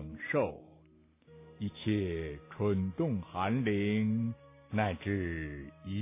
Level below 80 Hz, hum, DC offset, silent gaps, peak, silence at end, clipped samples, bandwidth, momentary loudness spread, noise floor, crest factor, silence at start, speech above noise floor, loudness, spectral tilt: -52 dBFS; none; under 0.1%; none; -16 dBFS; 0 s; under 0.1%; 3.8 kHz; 11 LU; -63 dBFS; 18 dB; 0 s; 30 dB; -34 LUFS; -6.5 dB/octave